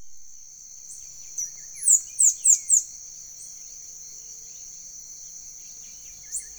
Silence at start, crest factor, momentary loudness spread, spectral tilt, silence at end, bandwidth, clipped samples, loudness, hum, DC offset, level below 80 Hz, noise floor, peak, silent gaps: 0 s; 24 dB; 22 LU; 3 dB/octave; 0.05 s; over 20 kHz; under 0.1%; -19 LUFS; none; under 0.1%; -64 dBFS; -44 dBFS; -4 dBFS; none